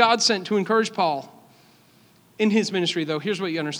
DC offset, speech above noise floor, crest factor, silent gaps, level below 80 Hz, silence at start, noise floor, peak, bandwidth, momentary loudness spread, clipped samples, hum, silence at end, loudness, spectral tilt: under 0.1%; 33 dB; 22 dB; none; -78 dBFS; 0 s; -56 dBFS; -2 dBFS; 12.5 kHz; 6 LU; under 0.1%; none; 0 s; -23 LUFS; -4 dB/octave